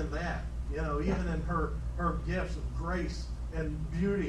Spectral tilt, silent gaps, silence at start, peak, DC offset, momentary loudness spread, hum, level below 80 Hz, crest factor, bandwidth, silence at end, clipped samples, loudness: -7.5 dB/octave; none; 0 s; -18 dBFS; under 0.1%; 6 LU; none; -36 dBFS; 16 dB; 10 kHz; 0 s; under 0.1%; -35 LUFS